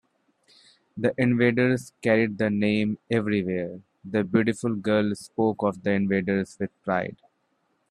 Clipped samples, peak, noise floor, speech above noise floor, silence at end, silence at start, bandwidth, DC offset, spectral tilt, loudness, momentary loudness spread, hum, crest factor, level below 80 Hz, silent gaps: under 0.1%; -6 dBFS; -71 dBFS; 47 dB; 0.75 s; 0.95 s; 11.5 kHz; under 0.1%; -7 dB/octave; -25 LUFS; 9 LU; none; 20 dB; -64 dBFS; none